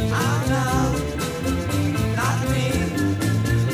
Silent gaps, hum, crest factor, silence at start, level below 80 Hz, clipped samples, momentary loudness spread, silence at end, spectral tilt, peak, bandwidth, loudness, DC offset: none; none; 12 dB; 0 s; -34 dBFS; under 0.1%; 4 LU; 0 s; -5.5 dB/octave; -10 dBFS; 16 kHz; -22 LUFS; under 0.1%